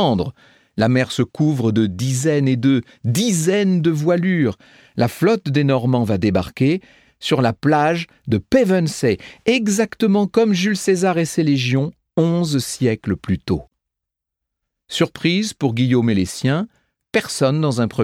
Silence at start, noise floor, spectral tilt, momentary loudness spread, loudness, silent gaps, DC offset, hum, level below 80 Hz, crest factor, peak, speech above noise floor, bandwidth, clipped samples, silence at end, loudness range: 0 s; -83 dBFS; -6 dB/octave; 6 LU; -18 LUFS; none; under 0.1%; none; -50 dBFS; 16 dB; -2 dBFS; 66 dB; 16 kHz; under 0.1%; 0 s; 4 LU